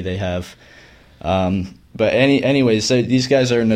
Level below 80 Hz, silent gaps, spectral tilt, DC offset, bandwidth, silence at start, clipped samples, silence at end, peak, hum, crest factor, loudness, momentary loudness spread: -46 dBFS; none; -5.5 dB/octave; under 0.1%; 11 kHz; 0 s; under 0.1%; 0 s; -2 dBFS; none; 16 dB; -17 LUFS; 13 LU